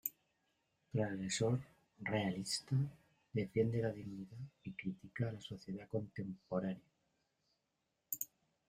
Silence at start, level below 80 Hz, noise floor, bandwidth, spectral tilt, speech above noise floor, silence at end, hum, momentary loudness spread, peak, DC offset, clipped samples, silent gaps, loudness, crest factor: 0.05 s; -72 dBFS; -86 dBFS; 15.5 kHz; -5.5 dB/octave; 45 dB; 0.4 s; none; 12 LU; -20 dBFS; under 0.1%; under 0.1%; none; -41 LUFS; 22 dB